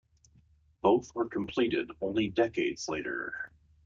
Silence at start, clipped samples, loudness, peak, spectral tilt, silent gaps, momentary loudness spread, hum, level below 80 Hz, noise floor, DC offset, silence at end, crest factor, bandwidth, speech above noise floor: 0.85 s; under 0.1%; -31 LUFS; -10 dBFS; -5 dB/octave; none; 9 LU; none; -62 dBFS; -64 dBFS; under 0.1%; 0.4 s; 20 dB; 7.6 kHz; 34 dB